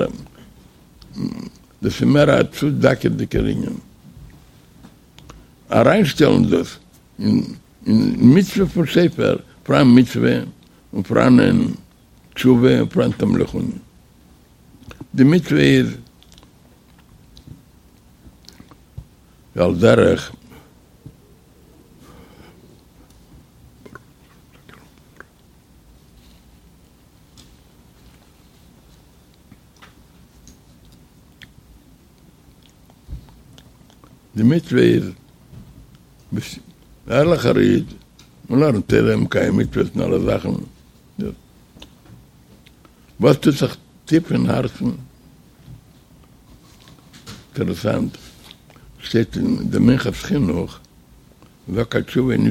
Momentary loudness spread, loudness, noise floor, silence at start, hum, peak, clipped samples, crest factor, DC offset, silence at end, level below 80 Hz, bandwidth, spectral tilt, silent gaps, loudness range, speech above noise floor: 21 LU; -17 LUFS; -51 dBFS; 0 s; none; 0 dBFS; under 0.1%; 20 dB; under 0.1%; 0 s; -44 dBFS; 15.5 kHz; -7 dB/octave; none; 9 LU; 35 dB